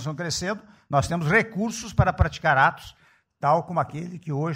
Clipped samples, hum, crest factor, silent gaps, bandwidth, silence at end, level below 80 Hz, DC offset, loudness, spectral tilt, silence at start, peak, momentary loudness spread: under 0.1%; none; 18 dB; none; 16 kHz; 0 s; -38 dBFS; under 0.1%; -24 LUFS; -5.5 dB/octave; 0 s; -6 dBFS; 11 LU